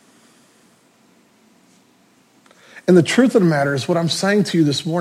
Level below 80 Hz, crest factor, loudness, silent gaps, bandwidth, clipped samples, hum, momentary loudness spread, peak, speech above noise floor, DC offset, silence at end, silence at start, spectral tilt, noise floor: -66 dBFS; 18 dB; -16 LUFS; none; 14.5 kHz; under 0.1%; none; 5 LU; -2 dBFS; 40 dB; under 0.1%; 0 s; 2.75 s; -5.5 dB/octave; -55 dBFS